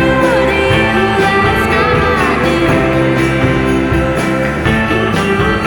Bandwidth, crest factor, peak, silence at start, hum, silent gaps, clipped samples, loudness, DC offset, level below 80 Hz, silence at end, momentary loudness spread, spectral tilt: 18.5 kHz; 12 dB; 0 dBFS; 0 s; none; none; under 0.1%; -12 LUFS; under 0.1%; -26 dBFS; 0 s; 3 LU; -6 dB/octave